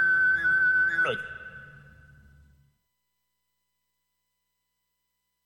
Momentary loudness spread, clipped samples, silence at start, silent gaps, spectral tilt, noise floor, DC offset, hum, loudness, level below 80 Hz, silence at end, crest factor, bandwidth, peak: 20 LU; under 0.1%; 0 s; none; -4 dB/octave; -80 dBFS; under 0.1%; 60 Hz at -80 dBFS; -23 LUFS; -62 dBFS; 3.75 s; 12 dB; 11.5 kHz; -18 dBFS